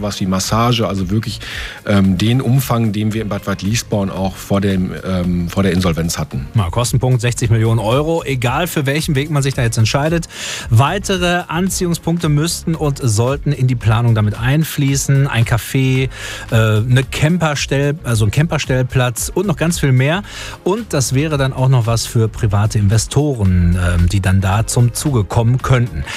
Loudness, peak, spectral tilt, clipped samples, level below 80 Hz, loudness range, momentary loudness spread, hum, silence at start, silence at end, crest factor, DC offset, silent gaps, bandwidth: -16 LUFS; -2 dBFS; -5.5 dB/octave; under 0.1%; -32 dBFS; 2 LU; 5 LU; none; 0 s; 0 s; 14 dB; under 0.1%; none; 15.5 kHz